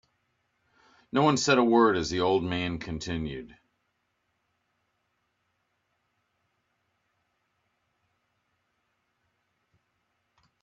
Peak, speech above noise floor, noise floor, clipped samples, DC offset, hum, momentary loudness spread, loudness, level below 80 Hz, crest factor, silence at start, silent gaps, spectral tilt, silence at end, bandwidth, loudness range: -8 dBFS; 52 dB; -77 dBFS; under 0.1%; under 0.1%; none; 13 LU; -26 LUFS; -58 dBFS; 24 dB; 1.15 s; none; -5 dB/octave; 7.15 s; 7.8 kHz; 15 LU